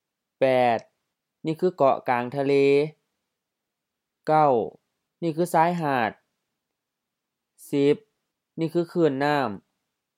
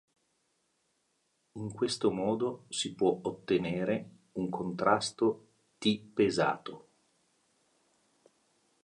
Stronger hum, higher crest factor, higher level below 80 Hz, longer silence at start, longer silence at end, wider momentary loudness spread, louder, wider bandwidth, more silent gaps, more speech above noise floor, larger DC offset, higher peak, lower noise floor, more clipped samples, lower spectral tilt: neither; about the same, 20 dB vs 22 dB; second, -76 dBFS vs -70 dBFS; second, 0.4 s vs 1.55 s; second, 0.6 s vs 2.05 s; about the same, 12 LU vs 13 LU; first, -24 LUFS vs -32 LUFS; first, 15.5 kHz vs 11.5 kHz; neither; first, 62 dB vs 45 dB; neither; first, -6 dBFS vs -12 dBFS; first, -84 dBFS vs -77 dBFS; neither; first, -6.5 dB/octave vs -5 dB/octave